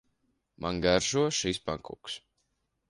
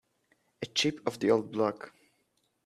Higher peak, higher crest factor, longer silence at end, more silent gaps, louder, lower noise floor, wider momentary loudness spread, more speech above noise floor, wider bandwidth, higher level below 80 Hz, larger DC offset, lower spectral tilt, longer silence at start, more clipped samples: about the same, -10 dBFS vs -12 dBFS; about the same, 22 dB vs 22 dB; about the same, 0.7 s vs 0.75 s; neither; about the same, -29 LUFS vs -30 LUFS; about the same, -78 dBFS vs -75 dBFS; about the same, 15 LU vs 17 LU; about the same, 48 dB vs 45 dB; second, 11.5 kHz vs 13.5 kHz; first, -54 dBFS vs -74 dBFS; neither; about the same, -3.5 dB/octave vs -4 dB/octave; about the same, 0.6 s vs 0.6 s; neither